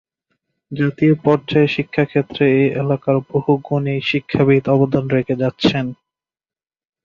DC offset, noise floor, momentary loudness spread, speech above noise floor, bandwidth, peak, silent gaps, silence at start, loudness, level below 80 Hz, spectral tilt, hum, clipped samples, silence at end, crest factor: under 0.1%; under -90 dBFS; 6 LU; over 74 dB; 7.2 kHz; -2 dBFS; none; 0.7 s; -17 LUFS; -52 dBFS; -8 dB/octave; none; under 0.1%; 1.1 s; 16 dB